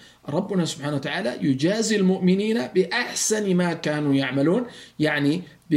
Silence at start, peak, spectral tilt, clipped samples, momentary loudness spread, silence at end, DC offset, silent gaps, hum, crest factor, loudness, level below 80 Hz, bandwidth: 0.25 s; -8 dBFS; -5 dB/octave; under 0.1%; 6 LU; 0 s; under 0.1%; none; none; 14 dB; -23 LUFS; -64 dBFS; 15.5 kHz